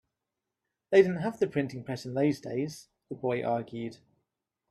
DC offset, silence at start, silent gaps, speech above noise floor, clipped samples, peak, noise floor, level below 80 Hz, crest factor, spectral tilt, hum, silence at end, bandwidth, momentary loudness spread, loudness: under 0.1%; 0.9 s; none; 58 dB; under 0.1%; -10 dBFS; -87 dBFS; -70 dBFS; 22 dB; -7 dB/octave; none; 0.75 s; 12 kHz; 16 LU; -30 LUFS